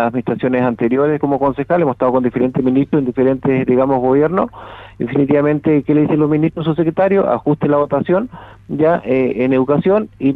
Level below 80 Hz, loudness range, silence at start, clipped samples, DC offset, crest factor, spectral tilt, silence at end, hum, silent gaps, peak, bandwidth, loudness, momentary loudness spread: -46 dBFS; 1 LU; 0 s; under 0.1%; under 0.1%; 12 dB; -10.5 dB/octave; 0 s; none; none; -2 dBFS; 4.1 kHz; -15 LUFS; 4 LU